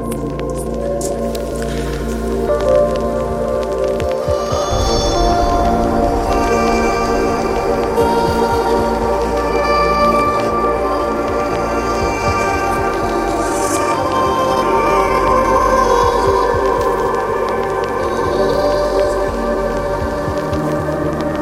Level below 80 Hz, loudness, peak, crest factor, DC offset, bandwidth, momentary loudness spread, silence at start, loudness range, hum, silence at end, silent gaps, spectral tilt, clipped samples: -28 dBFS; -16 LUFS; -2 dBFS; 14 dB; under 0.1%; 16.5 kHz; 6 LU; 0 s; 3 LU; none; 0 s; none; -5.5 dB/octave; under 0.1%